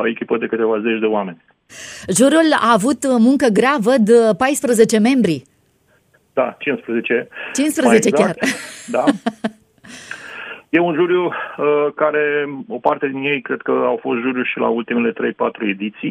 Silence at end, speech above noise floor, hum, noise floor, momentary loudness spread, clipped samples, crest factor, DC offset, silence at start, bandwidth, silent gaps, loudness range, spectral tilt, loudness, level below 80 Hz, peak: 0 s; 42 dB; none; -58 dBFS; 13 LU; under 0.1%; 16 dB; under 0.1%; 0 s; 15.5 kHz; none; 5 LU; -4.5 dB/octave; -17 LUFS; -62 dBFS; 0 dBFS